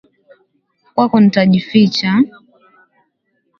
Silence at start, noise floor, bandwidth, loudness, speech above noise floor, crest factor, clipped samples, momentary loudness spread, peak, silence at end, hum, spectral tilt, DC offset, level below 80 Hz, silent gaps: 0.95 s; -66 dBFS; 7 kHz; -13 LUFS; 54 dB; 16 dB; under 0.1%; 7 LU; 0 dBFS; 1.3 s; none; -7 dB/octave; under 0.1%; -56 dBFS; none